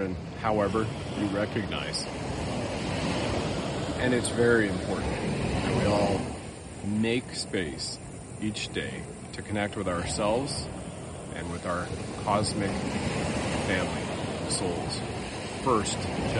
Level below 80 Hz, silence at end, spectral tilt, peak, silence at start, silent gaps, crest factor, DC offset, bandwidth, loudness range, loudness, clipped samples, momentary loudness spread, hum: -46 dBFS; 0 s; -5 dB/octave; -10 dBFS; 0 s; none; 20 dB; under 0.1%; 11.5 kHz; 5 LU; -30 LUFS; under 0.1%; 10 LU; none